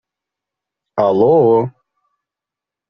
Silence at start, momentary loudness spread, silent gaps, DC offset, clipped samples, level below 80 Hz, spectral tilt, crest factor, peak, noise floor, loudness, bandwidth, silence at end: 0.95 s; 15 LU; none; under 0.1%; under 0.1%; -60 dBFS; -8.5 dB/octave; 16 dB; -2 dBFS; -86 dBFS; -13 LUFS; 5.6 kHz; 1.2 s